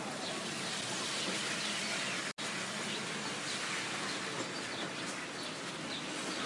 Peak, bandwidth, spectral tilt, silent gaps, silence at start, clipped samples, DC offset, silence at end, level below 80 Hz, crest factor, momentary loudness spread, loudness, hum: -24 dBFS; 11.5 kHz; -2 dB/octave; 2.33-2.37 s; 0 s; under 0.1%; under 0.1%; 0 s; -78 dBFS; 14 dB; 5 LU; -37 LUFS; none